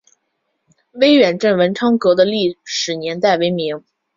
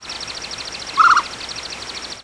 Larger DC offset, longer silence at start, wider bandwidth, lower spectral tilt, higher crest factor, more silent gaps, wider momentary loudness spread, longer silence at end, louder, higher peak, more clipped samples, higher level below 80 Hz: neither; first, 0.95 s vs 0 s; second, 7.6 kHz vs 11 kHz; first, -4.5 dB/octave vs -0.5 dB/octave; about the same, 16 dB vs 18 dB; neither; second, 9 LU vs 15 LU; first, 0.4 s vs 0 s; first, -15 LUFS vs -19 LUFS; about the same, -2 dBFS vs -2 dBFS; neither; second, -60 dBFS vs -50 dBFS